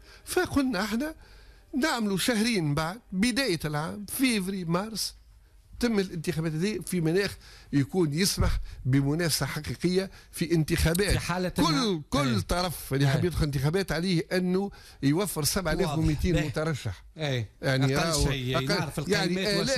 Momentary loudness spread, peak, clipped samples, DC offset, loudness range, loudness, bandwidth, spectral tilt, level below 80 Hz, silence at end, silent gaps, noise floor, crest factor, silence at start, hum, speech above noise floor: 7 LU; -14 dBFS; under 0.1%; under 0.1%; 3 LU; -28 LUFS; 14.5 kHz; -5 dB/octave; -42 dBFS; 0 s; none; -55 dBFS; 12 dB; 0.1 s; none; 28 dB